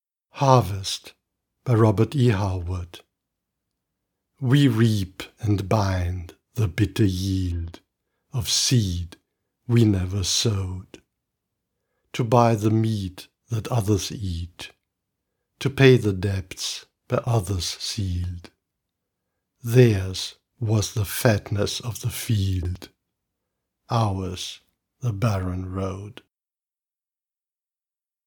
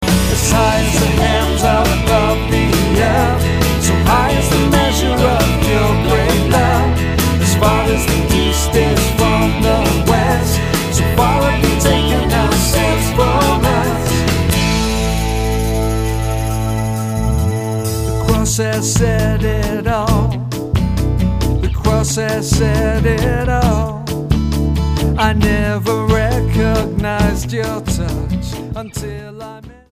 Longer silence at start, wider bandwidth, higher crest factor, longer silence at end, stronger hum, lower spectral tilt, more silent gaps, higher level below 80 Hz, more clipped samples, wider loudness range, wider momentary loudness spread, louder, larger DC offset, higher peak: first, 0.35 s vs 0 s; first, 19 kHz vs 15.5 kHz; first, 24 dB vs 14 dB; first, 2.15 s vs 0.2 s; neither; about the same, -5.5 dB/octave vs -5 dB/octave; neither; second, -52 dBFS vs -20 dBFS; neither; about the same, 5 LU vs 4 LU; first, 16 LU vs 6 LU; second, -23 LUFS vs -15 LUFS; neither; about the same, 0 dBFS vs 0 dBFS